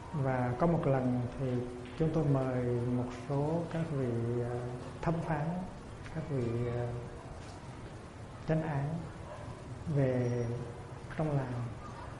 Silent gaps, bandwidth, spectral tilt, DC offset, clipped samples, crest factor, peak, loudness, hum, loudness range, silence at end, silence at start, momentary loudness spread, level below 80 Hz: none; 11.5 kHz; -8.5 dB/octave; under 0.1%; under 0.1%; 18 dB; -16 dBFS; -35 LUFS; none; 6 LU; 0 s; 0 s; 15 LU; -52 dBFS